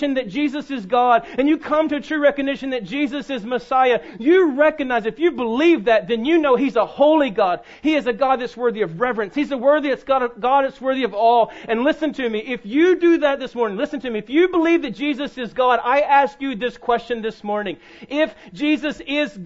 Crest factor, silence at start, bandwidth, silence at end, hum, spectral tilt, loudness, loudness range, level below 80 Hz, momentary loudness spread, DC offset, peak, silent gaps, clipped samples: 16 dB; 0 s; 7.8 kHz; 0 s; none; -6 dB/octave; -19 LUFS; 3 LU; -54 dBFS; 9 LU; under 0.1%; -2 dBFS; none; under 0.1%